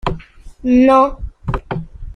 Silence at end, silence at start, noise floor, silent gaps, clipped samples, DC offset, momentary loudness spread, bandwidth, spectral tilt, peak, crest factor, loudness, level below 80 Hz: 0 s; 0.05 s; -35 dBFS; none; under 0.1%; under 0.1%; 17 LU; 9.2 kHz; -8 dB/octave; -2 dBFS; 14 dB; -15 LUFS; -30 dBFS